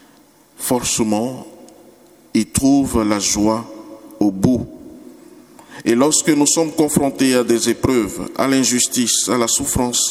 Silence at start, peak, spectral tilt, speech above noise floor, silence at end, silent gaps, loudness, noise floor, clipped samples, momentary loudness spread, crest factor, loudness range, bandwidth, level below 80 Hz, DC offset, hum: 0.6 s; 0 dBFS; -3.5 dB/octave; 33 dB; 0 s; none; -16 LUFS; -50 dBFS; under 0.1%; 10 LU; 18 dB; 4 LU; 17 kHz; -42 dBFS; under 0.1%; none